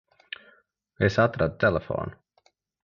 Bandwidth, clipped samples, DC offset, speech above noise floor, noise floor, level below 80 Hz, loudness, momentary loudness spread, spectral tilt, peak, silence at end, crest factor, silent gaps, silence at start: 7.4 kHz; under 0.1%; under 0.1%; 43 dB; -67 dBFS; -48 dBFS; -25 LUFS; 19 LU; -7 dB/octave; -6 dBFS; 0.7 s; 22 dB; none; 1 s